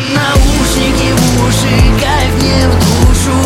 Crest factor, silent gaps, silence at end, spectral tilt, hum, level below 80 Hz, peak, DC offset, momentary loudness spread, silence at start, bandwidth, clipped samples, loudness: 8 dB; none; 0 s; -5 dB/octave; none; -14 dBFS; 0 dBFS; under 0.1%; 2 LU; 0 s; 16.5 kHz; under 0.1%; -10 LUFS